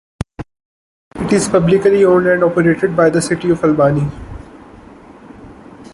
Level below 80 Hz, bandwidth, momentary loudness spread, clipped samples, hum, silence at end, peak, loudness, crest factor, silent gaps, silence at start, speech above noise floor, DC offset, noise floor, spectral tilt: -40 dBFS; 11.5 kHz; 22 LU; under 0.1%; none; 0.1 s; -2 dBFS; -13 LUFS; 14 dB; 0.65-1.11 s; 0.4 s; 26 dB; under 0.1%; -39 dBFS; -6.5 dB/octave